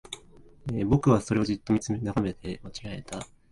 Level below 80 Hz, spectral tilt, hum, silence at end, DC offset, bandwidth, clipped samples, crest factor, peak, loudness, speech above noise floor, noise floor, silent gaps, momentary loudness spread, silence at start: -48 dBFS; -6.5 dB/octave; none; 0.25 s; under 0.1%; 11.5 kHz; under 0.1%; 20 dB; -8 dBFS; -28 LUFS; 25 dB; -52 dBFS; none; 17 LU; 0.1 s